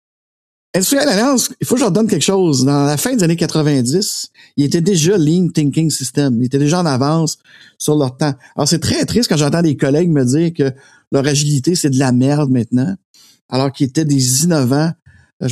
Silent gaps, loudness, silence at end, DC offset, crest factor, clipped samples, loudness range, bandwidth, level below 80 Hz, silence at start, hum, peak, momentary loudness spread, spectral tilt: 11.07-11.11 s, 13.05-13.14 s, 13.41-13.49 s, 15.02-15.06 s, 15.33-15.40 s; -15 LUFS; 0 s; under 0.1%; 14 dB; under 0.1%; 2 LU; 14.5 kHz; -50 dBFS; 0.75 s; none; -2 dBFS; 7 LU; -5 dB/octave